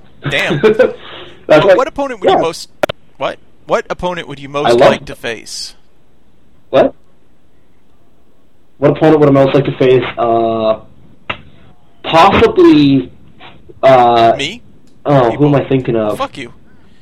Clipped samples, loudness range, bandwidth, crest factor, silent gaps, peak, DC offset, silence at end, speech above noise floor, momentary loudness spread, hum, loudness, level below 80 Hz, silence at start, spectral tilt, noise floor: 0.3%; 6 LU; 14.5 kHz; 12 dB; none; 0 dBFS; 1%; 0.55 s; 42 dB; 17 LU; none; -11 LUFS; -42 dBFS; 0.25 s; -6.5 dB/octave; -52 dBFS